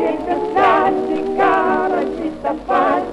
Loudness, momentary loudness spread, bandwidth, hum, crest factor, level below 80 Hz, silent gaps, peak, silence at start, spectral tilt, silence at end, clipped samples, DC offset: -17 LUFS; 9 LU; 11 kHz; none; 14 dB; -46 dBFS; none; -2 dBFS; 0 s; -6 dB/octave; 0 s; under 0.1%; under 0.1%